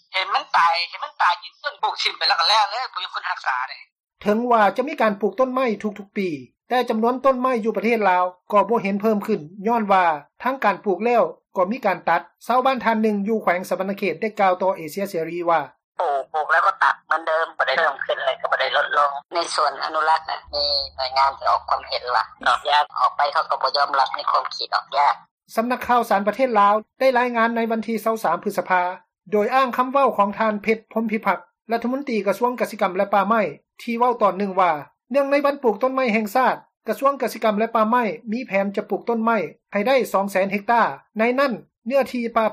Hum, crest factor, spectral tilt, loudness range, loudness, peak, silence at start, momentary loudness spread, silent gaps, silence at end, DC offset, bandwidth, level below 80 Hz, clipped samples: none; 14 dB; -4.5 dB/octave; 2 LU; -21 LUFS; -6 dBFS; 0.1 s; 8 LU; 3.92-3.96 s, 15.84-15.92 s, 25.31-25.38 s, 41.78-41.82 s; 0 s; under 0.1%; 15 kHz; -62 dBFS; under 0.1%